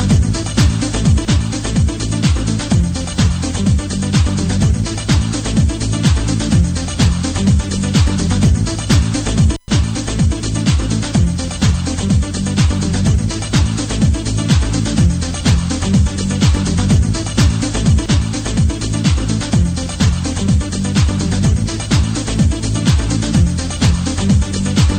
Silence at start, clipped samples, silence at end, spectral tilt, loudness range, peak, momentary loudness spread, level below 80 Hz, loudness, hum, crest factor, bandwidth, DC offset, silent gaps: 0 s; under 0.1%; 0 s; -5.5 dB/octave; 1 LU; -2 dBFS; 3 LU; -20 dBFS; -15 LUFS; none; 12 dB; 10 kHz; under 0.1%; none